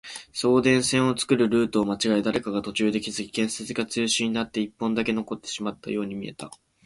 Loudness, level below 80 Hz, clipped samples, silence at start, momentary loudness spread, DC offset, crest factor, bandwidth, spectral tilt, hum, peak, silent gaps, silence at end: -25 LUFS; -58 dBFS; under 0.1%; 0.05 s; 11 LU; under 0.1%; 20 dB; 11.5 kHz; -4 dB/octave; none; -6 dBFS; none; 0.3 s